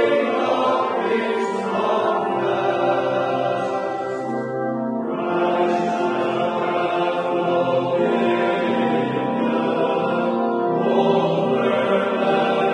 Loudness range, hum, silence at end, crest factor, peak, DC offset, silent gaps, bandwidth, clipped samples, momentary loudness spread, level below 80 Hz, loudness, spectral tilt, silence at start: 2 LU; none; 0 s; 14 dB; -6 dBFS; under 0.1%; none; 10 kHz; under 0.1%; 5 LU; -70 dBFS; -21 LUFS; -6.5 dB/octave; 0 s